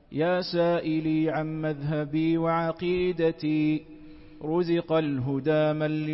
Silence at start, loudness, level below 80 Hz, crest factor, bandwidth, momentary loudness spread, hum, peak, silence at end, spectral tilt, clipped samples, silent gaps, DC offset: 0.1 s; -26 LUFS; -56 dBFS; 12 dB; 5.8 kHz; 5 LU; none; -14 dBFS; 0 s; -11 dB/octave; under 0.1%; none; under 0.1%